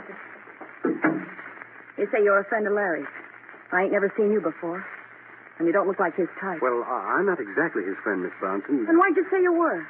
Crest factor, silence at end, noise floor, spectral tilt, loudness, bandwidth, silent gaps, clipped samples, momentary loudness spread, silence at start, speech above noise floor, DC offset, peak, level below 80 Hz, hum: 16 dB; 0 s; -47 dBFS; -6 dB/octave; -24 LUFS; 3.5 kHz; none; under 0.1%; 21 LU; 0 s; 23 dB; under 0.1%; -8 dBFS; -88 dBFS; none